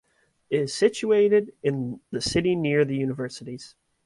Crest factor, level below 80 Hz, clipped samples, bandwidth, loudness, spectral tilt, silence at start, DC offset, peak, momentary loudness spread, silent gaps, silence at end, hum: 18 dB; -56 dBFS; under 0.1%; 11.5 kHz; -24 LUFS; -5.5 dB/octave; 0.5 s; under 0.1%; -6 dBFS; 13 LU; none; 0.4 s; none